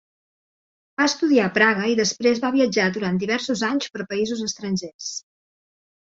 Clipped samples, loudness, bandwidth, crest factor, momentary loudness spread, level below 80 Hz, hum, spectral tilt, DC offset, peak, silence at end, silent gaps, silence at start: under 0.1%; -21 LUFS; 8 kHz; 20 dB; 11 LU; -64 dBFS; none; -4 dB/octave; under 0.1%; -4 dBFS; 0.95 s; 4.94-4.99 s; 1 s